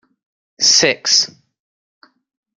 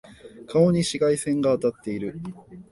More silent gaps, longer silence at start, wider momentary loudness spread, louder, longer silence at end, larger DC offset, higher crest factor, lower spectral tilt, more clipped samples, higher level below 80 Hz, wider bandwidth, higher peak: neither; first, 0.6 s vs 0.1 s; second, 6 LU vs 13 LU; first, -12 LUFS vs -23 LUFS; first, 1.35 s vs 0.1 s; neither; about the same, 20 dB vs 18 dB; second, 0 dB/octave vs -6 dB/octave; neither; second, -66 dBFS vs -56 dBFS; about the same, 12 kHz vs 11.5 kHz; first, 0 dBFS vs -6 dBFS